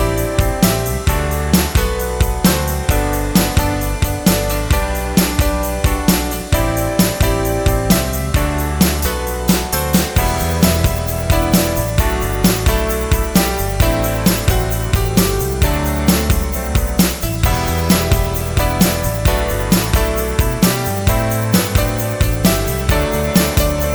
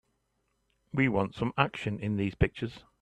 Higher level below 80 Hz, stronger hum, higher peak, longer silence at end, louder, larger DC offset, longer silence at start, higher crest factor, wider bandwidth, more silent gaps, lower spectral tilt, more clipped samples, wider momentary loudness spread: first, -20 dBFS vs -46 dBFS; neither; first, 0 dBFS vs -8 dBFS; second, 0 s vs 0.2 s; first, -16 LUFS vs -31 LUFS; neither; second, 0 s vs 0.95 s; second, 14 dB vs 24 dB; first, over 20 kHz vs 9.6 kHz; neither; second, -5 dB/octave vs -7.5 dB/octave; neither; second, 3 LU vs 9 LU